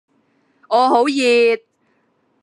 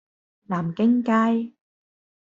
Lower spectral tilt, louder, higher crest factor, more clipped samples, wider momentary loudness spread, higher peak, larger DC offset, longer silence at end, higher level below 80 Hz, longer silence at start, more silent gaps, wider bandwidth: second, -2.5 dB/octave vs -8 dB/octave; first, -15 LUFS vs -22 LUFS; about the same, 16 dB vs 16 dB; neither; second, 6 LU vs 10 LU; first, -2 dBFS vs -8 dBFS; neither; about the same, 0.85 s vs 0.75 s; second, -84 dBFS vs -68 dBFS; first, 0.7 s vs 0.5 s; neither; first, 11.5 kHz vs 7.4 kHz